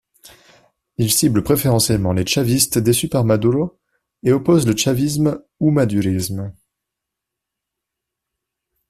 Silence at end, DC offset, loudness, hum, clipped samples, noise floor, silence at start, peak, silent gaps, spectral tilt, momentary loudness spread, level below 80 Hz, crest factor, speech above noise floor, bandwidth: 2.4 s; under 0.1%; -17 LUFS; none; under 0.1%; -82 dBFS; 1 s; -2 dBFS; none; -5 dB/octave; 8 LU; -46 dBFS; 18 dB; 66 dB; 16 kHz